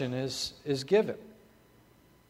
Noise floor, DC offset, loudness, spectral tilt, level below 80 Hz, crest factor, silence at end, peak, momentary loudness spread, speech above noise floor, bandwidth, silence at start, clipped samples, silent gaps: -61 dBFS; under 0.1%; -31 LUFS; -5 dB/octave; -66 dBFS; 20 dB; 0.95 s; -12 dBFS; 9 LU; 31 dB; 16 kHz; 0 s; under 0.1%; none